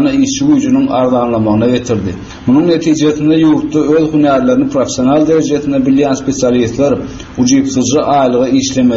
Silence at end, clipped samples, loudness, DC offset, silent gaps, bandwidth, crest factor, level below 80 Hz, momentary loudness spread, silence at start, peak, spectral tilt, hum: 0 s; under 0.1%; -11 LUFS; under 0.1%; none; 7.8 kHz; 10 dB; -38 dBFS; 4 LU; 0 s; 0 dBFS; -5.5 dB/octave; none